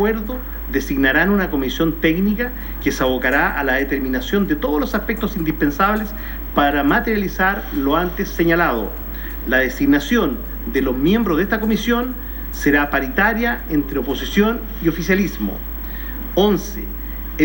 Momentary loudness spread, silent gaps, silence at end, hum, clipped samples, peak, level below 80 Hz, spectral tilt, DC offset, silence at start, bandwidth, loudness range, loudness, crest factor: 11 LU; none; 0 s; none; under 0.1%; -2 dBFS; -30 dBFS; -5.5 dB/octave; under 0.1%; 0 s; 16.5 kHz; 2 LU; -19 LUFS; 16 dB